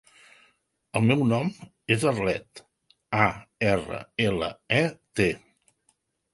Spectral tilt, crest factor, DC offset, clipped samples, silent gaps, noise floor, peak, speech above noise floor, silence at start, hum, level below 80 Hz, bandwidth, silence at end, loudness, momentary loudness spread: -6 dB/octave; 24 dB; under 0.1%; under 0.1%; none; -71 dBFS; -4 dBFS; 46 dB; 0.95 s; none; -54 dBFS; 11.5 kHz; 0.95 s; -26 LUFS; 9 LU